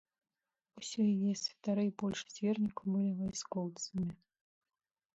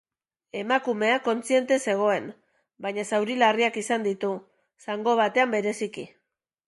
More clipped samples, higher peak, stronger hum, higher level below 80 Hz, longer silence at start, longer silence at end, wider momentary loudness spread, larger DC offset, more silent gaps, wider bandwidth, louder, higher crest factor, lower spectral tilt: neither; second, -24 dBFS vs -6 dBFS; neither; first, -70 dBFS vs -78 dBFS; first, 0.75 s vs 0.55 s; first, 1 s vs 0.6 s; second, 7 LU vs 14 LU; neither; neither; second, 8 kHz vs 11.5 kHz; second, -36 LUFS vs -25 LUFS; second, 14 dB vs 20 dB; first, -5.5 dB/octave vs -4 dB/octave